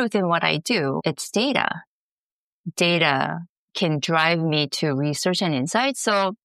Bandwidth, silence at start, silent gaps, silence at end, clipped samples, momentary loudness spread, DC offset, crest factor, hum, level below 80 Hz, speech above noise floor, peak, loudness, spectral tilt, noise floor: 14 kHz; 0 s; 1.87-2.64 s, 3.49-3.68 s; 0.1 s; under 0.1%; 8 LU; under 0.1%; 18 dB; none; -72 dBFS; over 68 dB; -4 dBFS; -22 LUFS; -4 dB/octave; under -90 dBFS